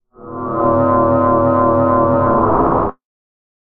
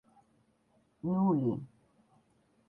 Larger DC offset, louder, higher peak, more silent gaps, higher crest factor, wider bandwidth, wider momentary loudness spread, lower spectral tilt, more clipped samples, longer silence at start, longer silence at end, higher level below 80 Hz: neither; first, -14 LUFS vs -32 LUFS; first, -2 dBFS vs -20 dBFS; neither; about the same, 12 dB vs 16 dB; first, 3.6 kHz vs 3.1 kHz; second, 10 LU vs 14 LU; about the same, -12 dB/octave vs -12 dB/octave; neither; second, 0.2 s vs 1.05 s; second, 0.8 s vs 1.05 s; first, -36 dBFS vs -72 dBFS